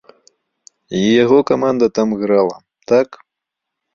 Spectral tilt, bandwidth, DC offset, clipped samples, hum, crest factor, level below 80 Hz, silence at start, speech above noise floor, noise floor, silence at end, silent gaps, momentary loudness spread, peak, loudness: -6 dB/octave; 7.6 kHz; under 0.1%; under 0.1%; none; 14 dB; -56 dBFS; 0.9 s; 67 dB; -81 dBFS; 0.8 s; none; 11 LU; -2 dBFS; -15 LUFS